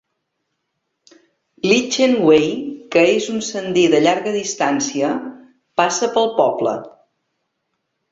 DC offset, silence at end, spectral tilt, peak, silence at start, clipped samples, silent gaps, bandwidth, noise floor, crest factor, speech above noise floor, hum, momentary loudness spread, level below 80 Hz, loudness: under 0.1%; 1.25 s; -3.5 dB/octave; -2 dBFS; 1.65 s; under 0.1%; none; 7.8 kHz; -74 dBFS; 18 dB; 58 dB; none; 10 LU; -60 dBFS; -17 LUFS